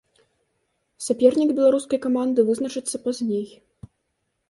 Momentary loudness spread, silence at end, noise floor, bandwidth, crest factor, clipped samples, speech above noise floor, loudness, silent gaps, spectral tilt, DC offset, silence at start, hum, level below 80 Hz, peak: 10 LU; 1 s; -75 dBFS; 11.5 kHz; 20 dB; under 0.1%; 54 dB; -22 LUFS; none; -5 dB/octave; under 0.1%; 1 s; none; -64 dBFS; -4 dBFS